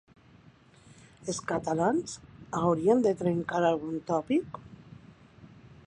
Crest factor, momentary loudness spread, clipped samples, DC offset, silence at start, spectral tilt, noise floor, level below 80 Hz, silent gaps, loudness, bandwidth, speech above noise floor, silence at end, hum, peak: 20 dB; 20 LU; under 0.1%; under 0.1%; 1.2 s; -6 dB/octave; -57 dBFS; -62 dBFS; none; -29 LUFS; 10.5 kHz; 30 dB; 0.4 s; none; -10 dBFS